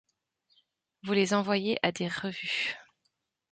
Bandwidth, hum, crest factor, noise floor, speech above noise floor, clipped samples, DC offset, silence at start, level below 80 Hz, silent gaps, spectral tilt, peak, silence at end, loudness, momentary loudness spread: 9.2 kHz; none; 24 dB; -79 dBFS; 50 dB; under 0.1%; under 0.1%; 1.05 s; -72 dBFS; none; -4.5 dB/octave; -10 dBFS; 0.7 s; -29 LUFS; 7 LU